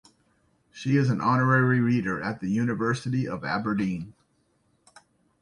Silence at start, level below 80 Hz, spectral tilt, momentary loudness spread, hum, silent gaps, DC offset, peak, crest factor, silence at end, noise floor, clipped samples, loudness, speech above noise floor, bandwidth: 0.75 s; -60 dBFS; -7.5 dB/octave; 9 LU; none; none; under 0.1%; -8 dBFS; 18 dB; 1.3 s; -69 dBFS; under 0.1%; -25 LUFS; 44 dB; 10.5 kHz